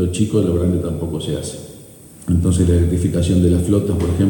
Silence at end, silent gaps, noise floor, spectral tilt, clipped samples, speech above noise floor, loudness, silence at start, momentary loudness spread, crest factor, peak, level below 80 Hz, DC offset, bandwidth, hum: 0 s; none; -40 dBFS; -7 dB/octave; under 0.1%; 24 dB; -17 LUFS; 0 s; 12 LU; 12 dB; -4 dBFS; -30 dBFS; under 0.1%; 17.5 kHz; none